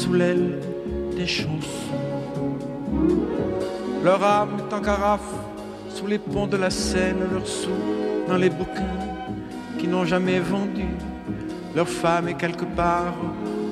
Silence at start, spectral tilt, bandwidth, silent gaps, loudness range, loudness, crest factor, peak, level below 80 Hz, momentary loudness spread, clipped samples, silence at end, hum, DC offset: 0 s; -5.5 dB/octave; 14 kHz; none; 3 LU; -24 LUFS; 18 dB; -6 dBFS; -42 dBFS; 10 LU; under 0.1%; 0 s; none; under 0.1%